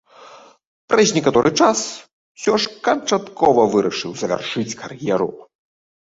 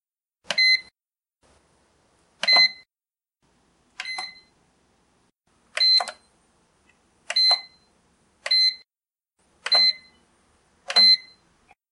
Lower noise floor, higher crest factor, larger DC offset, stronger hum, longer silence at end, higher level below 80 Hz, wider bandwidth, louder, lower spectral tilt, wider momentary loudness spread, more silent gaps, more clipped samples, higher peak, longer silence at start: second, -44 dBFS vs under -90 dBFS; about the same, 18 dB vs 22 dB; neither; neither; about the same, 0.7 s vs 0.7 s; first, -56 dBFS vs -74 dBFS; second, 8 kHz vs 11.5 kHz; about the same, -18 LUFS vs -18 LUFS; first, -4 dB/octave vs 1.5 dB/octave; second, 11 LU vs 21 LU; first, 0.67-0.88 s, 2.13-2.35 s vs none; neither; about the same, -2 dBFS vs -4 dBFS; second, 0.2 s vs 0.5 s